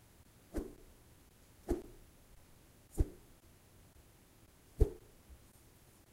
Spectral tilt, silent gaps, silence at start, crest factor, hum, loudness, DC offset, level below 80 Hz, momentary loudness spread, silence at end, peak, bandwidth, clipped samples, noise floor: -7.5 dB/octave; none; 0.55 s; 28 dB; none; -42 LUFS; under 0.1%; -44 dBFS; 26 LU; 0.8 s; -16 dBFS; 16 kHz; under 0.1%; -64 dBFS